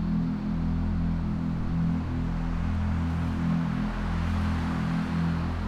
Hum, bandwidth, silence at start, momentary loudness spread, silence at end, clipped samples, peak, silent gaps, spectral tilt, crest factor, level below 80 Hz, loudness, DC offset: none; 8.6 kHz; 0 s; 2 LU; 0 s; under 0.1%; -16 dBFS; none; -8 dB/octave; 10 dB; -34 dBFS; -29 LUFS; under 0.1%